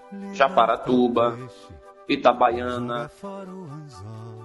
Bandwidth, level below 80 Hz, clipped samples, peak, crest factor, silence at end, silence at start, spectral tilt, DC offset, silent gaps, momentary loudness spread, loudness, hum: 11.5 kHz; -56 dBFS; under 0.1%; -4 dBFS; 20 dB; 0 s; 0.05 s; -6.5 dB/octave; under 0.1%; none; 21 LU; -22 LUFS; none